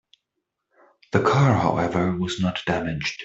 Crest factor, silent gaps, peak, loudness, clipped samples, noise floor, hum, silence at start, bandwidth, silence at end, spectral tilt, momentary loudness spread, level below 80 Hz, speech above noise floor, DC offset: 20 dB; none; -4 dBFS; -22 LUFS; under 0.1%; -80 dBFS; none; 1.15 s; 8 kHz; 0 s; -6.5 dB/octave; 7 LU; -52 dBFS; 59 dB; under 0.1%